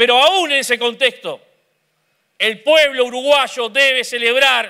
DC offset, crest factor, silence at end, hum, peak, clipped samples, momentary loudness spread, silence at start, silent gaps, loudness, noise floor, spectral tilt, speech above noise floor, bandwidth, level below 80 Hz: under 0.1%; 14 dB; 0 s; none; -2 dBFS; under 0.1%; 7 LU; 0 s; none; -14 LUFS; -65 dBFS; -0.5 dB/octave; 50 dB; 16 kHz; -68 dBFS